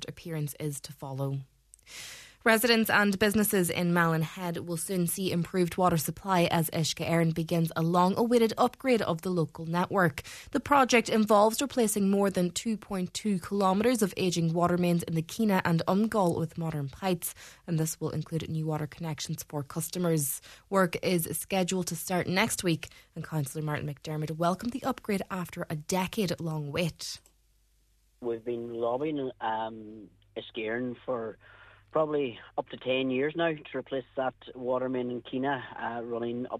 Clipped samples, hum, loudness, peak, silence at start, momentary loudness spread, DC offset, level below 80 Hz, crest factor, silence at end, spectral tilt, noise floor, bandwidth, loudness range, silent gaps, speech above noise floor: under 0.1%; none; -29 LUFS; -8 dBFS; 0 s; 11 LU; under 0.1%; -60 dBFS; 22 dB; 0 s; -5 dB/octave; -67 dBFS; 14 kHz; 8 LU; none; 38 dB